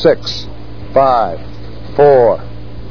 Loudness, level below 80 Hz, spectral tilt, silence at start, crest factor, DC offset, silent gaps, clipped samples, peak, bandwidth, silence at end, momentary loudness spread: -12 LUFS; -34 dBFS; -6.5 dB/octave; 0 s; 14 dB; 5%; none; 0.1%; 0 dBFS; 5.4 kHz; 0 s; 23 LU